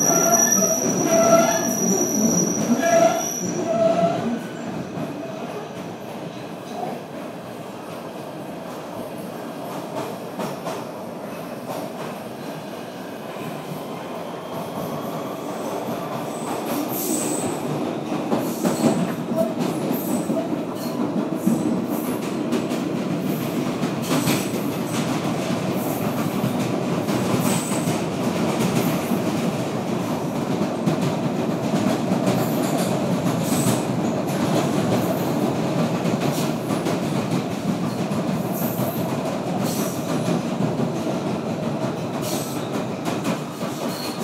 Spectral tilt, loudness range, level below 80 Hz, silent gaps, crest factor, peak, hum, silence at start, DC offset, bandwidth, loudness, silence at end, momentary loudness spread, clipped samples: -4.5 dB/octave; 11 LU; -60 dBFS; none; 20 dB; -2 dBFS; none; 0 s; under 0.1%; 16 kHz; -23 LUFS; 0 s; 13 LU; under 0.1%